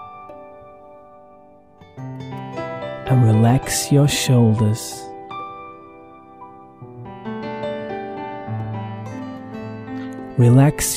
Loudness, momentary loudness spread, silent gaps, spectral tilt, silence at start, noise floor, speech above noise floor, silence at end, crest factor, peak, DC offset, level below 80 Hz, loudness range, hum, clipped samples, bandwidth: -19 LUFS; 25 LU; none; -6 dB/octave; 0 s; -48 dBFS; 33 dB; 0 s; 18 dB; -2 dBFS; under 0.1%; -46 dBFS; 14 LU; none; under 0.1%; 16 kHz